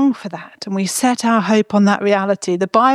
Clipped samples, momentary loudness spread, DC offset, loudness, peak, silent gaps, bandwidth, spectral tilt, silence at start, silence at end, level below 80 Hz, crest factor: under 0.1%; 11 LU; under 0.1%; -16 LUFS; -2 dBFS; none; 14.5 kHz; -5 dB/octave; 0 s; 0 s; -66 dBFS; 14 dB